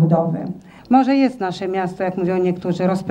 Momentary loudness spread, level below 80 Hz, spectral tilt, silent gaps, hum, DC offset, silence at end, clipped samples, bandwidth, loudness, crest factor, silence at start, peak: 9 LU; -58 dBFS; -8 dB/octave; none; none; under 0.1%; 0 s; under 0.1%; 10 kHz; -19 LUFS; 18 dB; 0 s; -2 dBFS